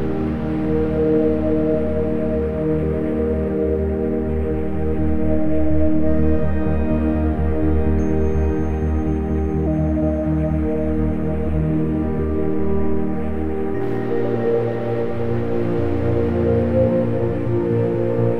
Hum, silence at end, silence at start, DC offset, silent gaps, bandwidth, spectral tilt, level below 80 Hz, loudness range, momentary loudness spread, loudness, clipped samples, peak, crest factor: none; 0 s; 0 s; under 0.1%; none; 4.4 kHz; -10.5 dB/octave; -28 dBFS; 2 LU; 4 LU; -20 LUFS; under 0.1%; -4 dBFS; 14 dB